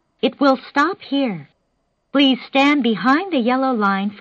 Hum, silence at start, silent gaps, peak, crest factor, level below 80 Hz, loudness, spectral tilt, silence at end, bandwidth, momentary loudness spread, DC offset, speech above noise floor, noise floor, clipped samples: none; 0.25 s; none; -2 dBFS; 16 dB; -64 dBFS; -18 LUFS; -5.5 dB/octave; 0 s; 7.4 kHz; 7 LU; under 0.1%; 51 dB; -68 dBFS; under 0.1%